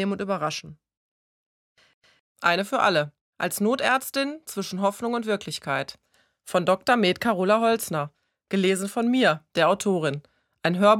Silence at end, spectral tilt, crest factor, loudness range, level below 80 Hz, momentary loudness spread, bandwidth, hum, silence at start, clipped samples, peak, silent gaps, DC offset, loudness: 0 s; -4.5 dB/octave; 20 dB; 4 LU; -68 dBFS; 9 LU; 18 kHz; none; 0 s; under 0.1%; -4 dBFS; 0.97-1.76 s, 1.94-2.02 s, 2.20-2.35 s, 3.21-3.33 s; under 0.1%; -24 LUFS